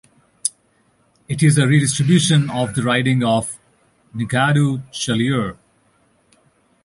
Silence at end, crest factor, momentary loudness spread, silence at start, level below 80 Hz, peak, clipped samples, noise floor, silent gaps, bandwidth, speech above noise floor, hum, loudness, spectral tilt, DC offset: 1.3 s; 18 dB; 14 LU; 0.45 s; -52 dBFS; -2 dBFS; under 0.1%; -60 dBFS; none; 11.5 kHz; 43 dB; none; -18 LUFS; -5 dB/octave; under 0.1%